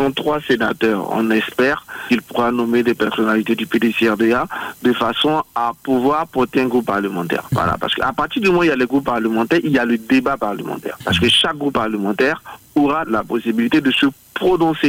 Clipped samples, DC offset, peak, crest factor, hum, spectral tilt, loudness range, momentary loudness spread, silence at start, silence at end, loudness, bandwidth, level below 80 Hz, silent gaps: under 0.1%; under 0.1%; -6 dBFS; 12 dB; none; -5.5 dB/octave; 1 LU; 5 LU; 0 s; 0 s; -17 LUFS; 16.5 kHz; -48 dBFS; none